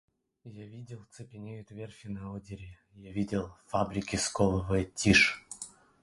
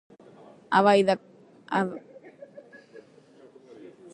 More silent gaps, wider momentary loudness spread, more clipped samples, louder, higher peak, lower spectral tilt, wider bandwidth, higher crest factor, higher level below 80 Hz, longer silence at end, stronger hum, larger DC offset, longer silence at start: neither; second, 24 LU vs 28 LU; neither; second, -29 LUFS vs -24 LUFS; about the same, -8 dBFS vs -6 dBFS; second, -4 dB/octave vs -6 dB/octave; about the same, 11.5 kHz vs 10.5 kHz; about the same, 24 dB vs 22 dB; first, -50 dBFS vs -70 dBFS; second, 0.35 s vs 1.15 s; neither; neither; second, 0.45 s vs 0.7 s